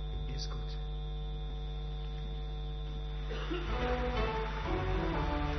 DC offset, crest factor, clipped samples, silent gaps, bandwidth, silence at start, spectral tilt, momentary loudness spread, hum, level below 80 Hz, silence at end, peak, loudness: under 0.1%; 14 dB; under 0.1%; none; 6.2 kHz; 0 s; -5 dB/octave; 7 LU; none; -38 dBFS; 0 s; -20 dBFS; -38 LUFS